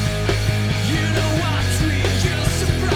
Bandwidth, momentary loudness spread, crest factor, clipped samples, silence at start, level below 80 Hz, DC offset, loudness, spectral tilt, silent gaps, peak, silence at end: 17 kHz; 1 LU; 14 dB; under 0.1%; 0 s; -28 dBFS; 0.3%; -19 LUFS; -5 dB/octave; none; -4 dBFS; 0 s